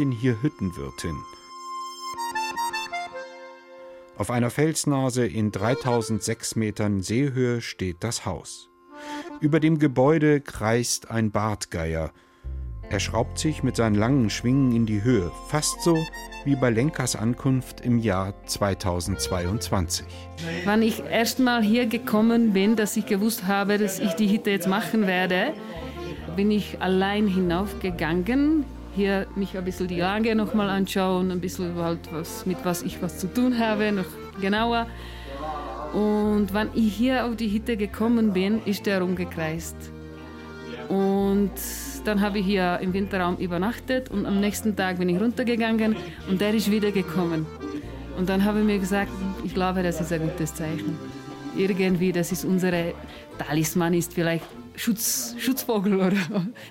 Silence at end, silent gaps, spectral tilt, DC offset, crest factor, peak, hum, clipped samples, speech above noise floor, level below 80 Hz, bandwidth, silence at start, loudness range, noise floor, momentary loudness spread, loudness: 0 s; none; -5.5 dB/octave; under 0.1%; 16 dB; -10 dBFS; none; under 0.1%; 20 dB; -44 dBFS; 16.5 kHz; 0 s; 4 LU; -44 dBFS; 13 LU; -25 LUFS